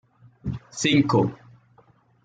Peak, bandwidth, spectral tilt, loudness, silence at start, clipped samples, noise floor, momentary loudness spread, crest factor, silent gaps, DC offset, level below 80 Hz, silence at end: -8 dBFS; 9.4 kHz; -5 dB/octave; -23 LUFS; 0.45 s; under 0.1%; -58 dBFS; 15 LU; 18 dB; none; under 0.1%; -54 dBFS; 0.9 s